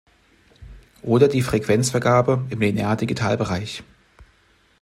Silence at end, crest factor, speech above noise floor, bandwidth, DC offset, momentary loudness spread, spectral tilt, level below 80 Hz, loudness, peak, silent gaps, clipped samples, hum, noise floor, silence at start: 0.6 s; 20 dB; 39 dB; 15 kHz; under 0.1%; 10 LU; -6 dB/octave; -50 dBFS; -20 LUFS; -2 dBFS; none; under 0.1%; none; -59 dBFS; 0.6 s